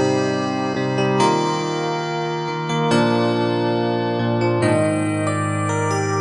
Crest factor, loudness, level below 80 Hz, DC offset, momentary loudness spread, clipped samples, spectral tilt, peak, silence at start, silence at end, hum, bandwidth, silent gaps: 14 dB; -20 LUFS; -60 dBFS; under 0.1%; 5 LU; under 0.1%; -6 dB/octave; -4 dBFS; 0 s; 0 s; none; 11 kHz; none